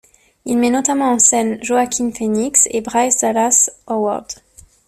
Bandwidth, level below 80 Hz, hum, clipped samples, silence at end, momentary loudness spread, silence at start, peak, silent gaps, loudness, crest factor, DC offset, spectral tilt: 14.5 kHz; -54 dBFS; none; under 0.1%; 0.55 s; 10 LU; 0.45 s; 0 dBFS; none; -15 LUFS; 16 dB; under 0.1%; -2.5 dB/octave